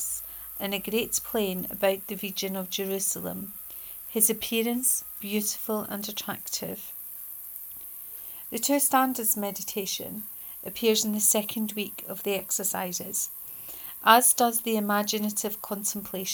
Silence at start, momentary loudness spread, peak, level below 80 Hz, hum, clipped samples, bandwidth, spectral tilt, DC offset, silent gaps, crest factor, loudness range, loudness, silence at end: 0 s; 15 LU; -2 dBFS; -64 dBFS; none; under 0.1%; over 20 kHz; -2.5 dB/octave; under 0.1%; none; 26 dB; 5 LU; -27 LUFS; 0 s